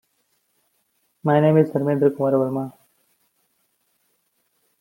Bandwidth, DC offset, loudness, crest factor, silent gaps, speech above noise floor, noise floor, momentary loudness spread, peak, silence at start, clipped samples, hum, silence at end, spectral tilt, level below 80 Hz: 16.5 kHz; under 0.1%; -20 LUFS; 20 dB; none; 51 dB; -69 dBFS; 12 LU; -4 dBFS; 1.25 s; under 0.1%; none; 2.1 s; -9.5 dB/octave; -68 dBFS